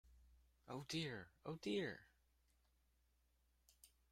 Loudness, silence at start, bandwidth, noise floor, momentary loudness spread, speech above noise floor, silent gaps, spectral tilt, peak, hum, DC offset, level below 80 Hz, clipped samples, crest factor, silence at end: -48 LUFS; 0.05 s; 16 kHz; -80 dBFS; 10 LU; 33 dB; none; -5 dB/octave; -32 dBFS; none; under 0.1%; -76 dBFS; under 0.1%; 20 dB; 0.25 s